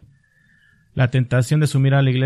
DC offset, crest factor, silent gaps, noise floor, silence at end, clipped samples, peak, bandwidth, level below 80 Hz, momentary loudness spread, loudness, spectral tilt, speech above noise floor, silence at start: under 0.1%; 14 dB; none; -57 dBFS; 0 s; under 0.1%; -4 dBFS; 12.5 kHz; -52 dBFS; 5 LU; -18 LUFS; -7 dB/octave; 41 dB; 0.95 s